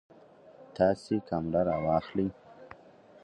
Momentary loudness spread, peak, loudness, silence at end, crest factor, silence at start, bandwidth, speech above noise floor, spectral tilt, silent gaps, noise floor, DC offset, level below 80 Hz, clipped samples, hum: 23 LU; -12 dBFS; -30 LUFS; 0.55 s; 20 dB; 0.6 s; 11 kHz; 27 dB; -8 dB/octave; none; -56 dBFS; under 0.1%; -56 dBFS; under 0.1%; none